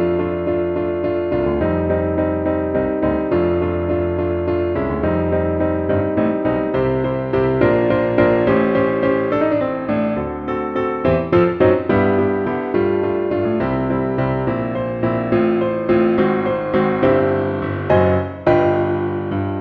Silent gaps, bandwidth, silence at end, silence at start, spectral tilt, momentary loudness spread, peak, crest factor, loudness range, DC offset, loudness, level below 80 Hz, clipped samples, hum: none; 5 kHz; 0 s; 0 s; -10 dB/octave; 5 LU; 0 dBFS; 16 dB; 2 LU; under 0.1%; -18 LUFS; -38 dBFS; under 0.1%; none